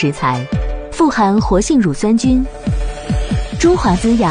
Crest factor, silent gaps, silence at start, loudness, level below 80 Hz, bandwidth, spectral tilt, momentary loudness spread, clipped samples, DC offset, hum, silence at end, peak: 12 dB; none; 0 s; -15 LUFS; -24 dBFS; 10 kHz; -6 dB/octave; 8 LU; under 0.1%; under 0.1%; none; 0 s; -2 dBFS